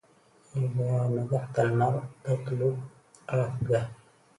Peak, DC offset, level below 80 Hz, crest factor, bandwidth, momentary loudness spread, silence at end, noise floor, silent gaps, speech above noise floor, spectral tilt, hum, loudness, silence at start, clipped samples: -12 dBFS; under 0.1%; -60 dBFS; 16 dB; 11 kHz; 11 LU; 0.45 s; -61 dBFS; none; 33 dB; -8.5 dB/octave; none; -29 LUFS; 0.55 s; under 0.1%